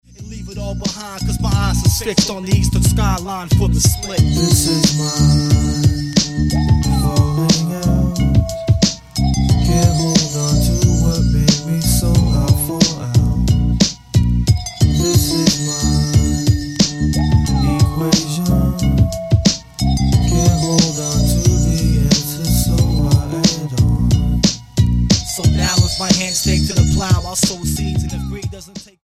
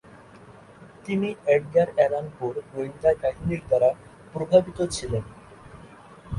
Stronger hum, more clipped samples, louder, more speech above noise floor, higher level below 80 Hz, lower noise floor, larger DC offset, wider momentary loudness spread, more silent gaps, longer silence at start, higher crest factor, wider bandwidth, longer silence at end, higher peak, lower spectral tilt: neither; neither; first, -15 LUFS vs -24 LUFS; second, 20 dB vs 25 dB; first, -22 dBFS vs -48 dBFS; second, -35 dBFS vs -48 dBFS; neither; second, 5 LU vs 13 LU; neither; second, 0.2 s vs 0.45 s; second, 14 dB vs 20 dB; first, 16 kHz vs 11.5 kHz; first, 0.2 s vs 0 s; first, 0 dBFS vs -4 dBFS; about the same, -5 dB/octave vs -6 dB/octave